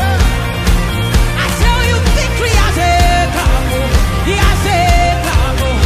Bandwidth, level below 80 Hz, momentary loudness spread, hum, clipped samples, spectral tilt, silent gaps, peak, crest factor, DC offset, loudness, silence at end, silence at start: 15.5 kHz; -14 dBFS; 4 LU; none; under 0.1%; -4.5 dB/octave; none; 0 dBFS; 12 dB; under 0.1%; -13 LUFS; 0 s; 0 s